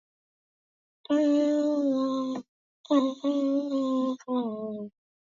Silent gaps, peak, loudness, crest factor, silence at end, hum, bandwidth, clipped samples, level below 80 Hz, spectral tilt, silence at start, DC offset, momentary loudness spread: 2.48-2.84 s; -12 dBFS; -27 LUFS; 16 dB; 0.5 s; none; 7.4 kHz; under 0.1%; -80 dBFS; -6 dB/octave; 1.1 s; under 0.1%; 12 LU